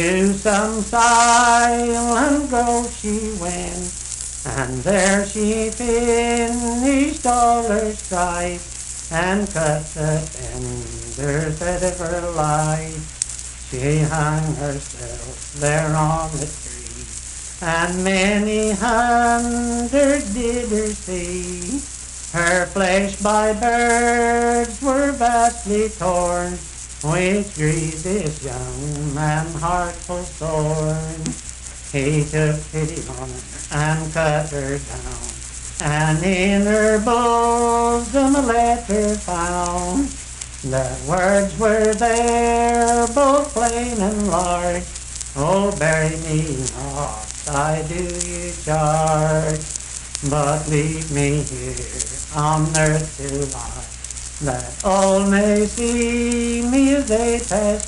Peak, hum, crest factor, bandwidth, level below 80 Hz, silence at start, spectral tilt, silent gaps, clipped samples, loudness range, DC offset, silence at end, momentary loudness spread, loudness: 0 dBFS; none; 18 dB; 11.5 kHz; -34 dBFS; 0 s; -4.5 dB/octave; none; under 0.1%; 6 LU; under 0.1%; 0 s; 12 LU; -19 LUFS